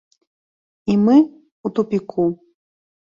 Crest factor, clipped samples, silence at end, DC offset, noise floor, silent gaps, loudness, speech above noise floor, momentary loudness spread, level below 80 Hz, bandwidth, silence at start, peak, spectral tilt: 18 dB; under 0.1%; 0.8 s; under 0.1%; under -90 dBFS; 1.52-1.64 s; -18 LUFS; over 74 dB; 16 LU; -60 dBFS; 7.2 kHz; 0.85 s; -4 dBFS; -9 dB/octave